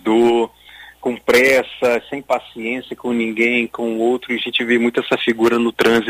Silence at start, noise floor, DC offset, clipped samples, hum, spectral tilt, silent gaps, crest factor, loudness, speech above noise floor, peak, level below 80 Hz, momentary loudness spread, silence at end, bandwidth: 0.05 s; -42 dBFS; under 0.1%; under 0.1%; none; -4 dB/octave; none; 14 dB; -17 LUFS; 25 dB; -2 dBFS; -54 dBFS; 10 LU; 0 s; 16 kHz